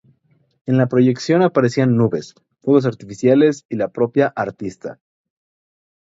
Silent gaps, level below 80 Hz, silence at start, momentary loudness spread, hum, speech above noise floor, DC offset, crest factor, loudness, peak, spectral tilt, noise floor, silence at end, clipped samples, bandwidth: 3.65-3.69 s; -60 dBFS; 0.65 s; 14 LU; none; 44 dB; under 0.1%; 18 dB; -17 LUFS; 0 dBFS; -7.5 dB/octave; -60 dBFS; 1.1 s; under 0.1%; 7.8 kHz